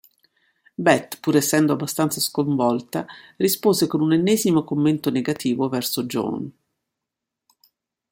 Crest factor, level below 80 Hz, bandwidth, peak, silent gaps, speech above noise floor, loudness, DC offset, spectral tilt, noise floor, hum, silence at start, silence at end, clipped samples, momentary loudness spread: 18 dB; -64 dBFS; 16.5 kHz; -4 dBFS; none; 64 dB; -21 LUFS; under 0.1%; -5 dB/octave; -84 dBFS; none; 0.8 s; 1.6 s; under 0.1%; 10 LU